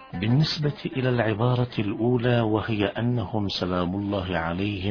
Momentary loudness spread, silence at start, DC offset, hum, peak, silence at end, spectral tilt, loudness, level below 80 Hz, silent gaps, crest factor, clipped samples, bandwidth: 5 LU; 0 s; under 0.1%; none; -8 dBFS; 0 s; -7.5 dB/octave; -25 LUFS; -50 dBFS; none; 18 dB; under 0.1%; 5.4 kHz